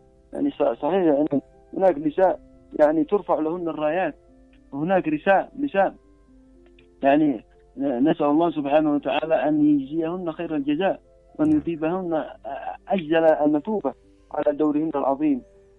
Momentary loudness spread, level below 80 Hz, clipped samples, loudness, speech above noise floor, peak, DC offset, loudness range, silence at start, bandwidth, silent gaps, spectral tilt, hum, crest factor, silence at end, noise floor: 11 LU; -56 dBFS; under 0.1%; -23 LUFS; 31 dB; -4 dBFS; under 0.1%; 3 LU; 0.35 s; 4 kHz; none; -8.5 dB/octave; none; 18 dB; 0.35 s; -53 dBFS